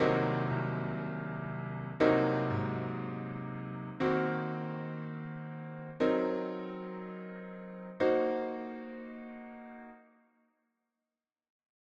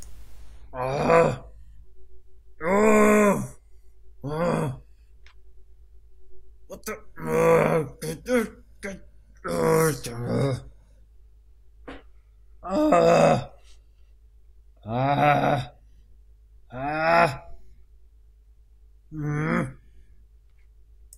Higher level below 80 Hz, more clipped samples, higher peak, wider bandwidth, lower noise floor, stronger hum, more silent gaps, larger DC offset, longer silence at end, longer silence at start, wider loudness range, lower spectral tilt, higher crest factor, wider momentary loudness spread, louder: second, -68 dBFS vs -50 dBFS; neither; second, -14 dBFS vs -6 dBFS; second, 7.4 kHz vs 16 kHz; first, under -90 dBFS vs -54 dBFS; neither; neither; neither; first, 1.95 s vs 1.15 s; about the same, 0 s vs 0 s; second, 5 LU vs 10 LU; first, -8.5 dB/octave vs -6 dB/octave; about the same, 22 dB vs 20 dB; second, 16 LU vs 23 LU; second, -34 LUFS vs -23 LUFS